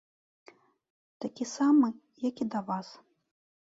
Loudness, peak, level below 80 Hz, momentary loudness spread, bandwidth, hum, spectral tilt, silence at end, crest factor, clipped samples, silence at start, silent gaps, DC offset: -30 LUFS; -14 dBFS; -80 dBFS; 17 LU; 7.8 kHz; none; -5.5 dB/octave; 0.65 s; 18 dB; under 0.1%; 1.2 s; none; under 0.1%